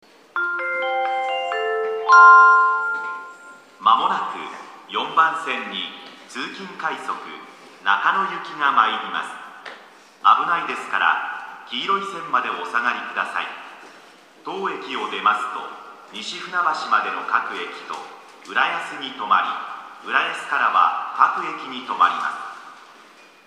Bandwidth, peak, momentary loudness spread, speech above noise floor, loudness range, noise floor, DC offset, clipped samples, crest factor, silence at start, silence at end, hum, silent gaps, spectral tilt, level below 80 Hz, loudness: 11.5 kHz; 0 dBFS; 17 LU; 28 dB; 9 LU; -48 dBFS; under 0.1%; under 0.1%; 22 dB; 0.35 s; 0.65 s; none; none; -2 dB/octave; -86 dBFS; -20 LUFS